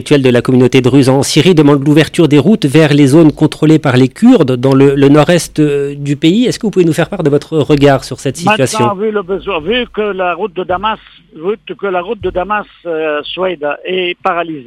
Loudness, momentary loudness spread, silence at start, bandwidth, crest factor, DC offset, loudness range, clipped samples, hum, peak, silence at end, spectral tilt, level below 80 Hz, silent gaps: -10 LUFS; 10 LU; 0 s; 15 kHz; 10 dB; under 0.1%; 9 LU; 1%; none; 0 dBFS; 0 s; -6 dB/octave; -40 dBFS; none